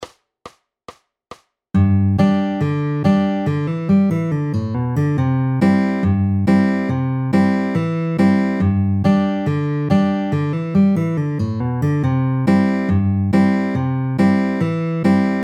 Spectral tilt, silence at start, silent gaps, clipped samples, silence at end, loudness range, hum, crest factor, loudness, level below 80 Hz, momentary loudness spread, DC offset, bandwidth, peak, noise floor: -9 dB/octave; 0 s; none; under 0.1%; 0 s; 1 LU; none; 14 dB; -17 LUFS; -48 dBFS; 5 LU; under 0.1%; 8.8 kHz; -2 dBFS; -44 dBFS